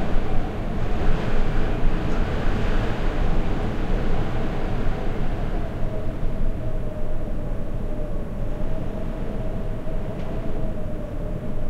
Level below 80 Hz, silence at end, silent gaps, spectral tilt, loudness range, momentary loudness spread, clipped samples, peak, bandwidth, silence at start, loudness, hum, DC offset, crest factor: -24 dBFS; 0 s; none; -7.5 dB/octave; 5 LU; 5 LU; under 0.1%; -6 dBFS; 5.2 kHz; 0 s; -29 LUFS; none; under 0.1%; 14 dB